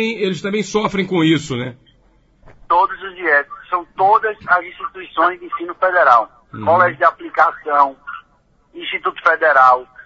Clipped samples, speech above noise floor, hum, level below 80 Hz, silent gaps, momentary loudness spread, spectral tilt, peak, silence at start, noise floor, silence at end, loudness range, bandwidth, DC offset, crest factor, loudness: under 0.1%; 40 dB; none; -54 dBFS; none; 14 LU; -5 dB/octave; 0 dBFS; 0 s; -56 dBFS; 0.05 s; 3 LU; 8 kHz; under 0.1%; 18 dB; -16 LUFS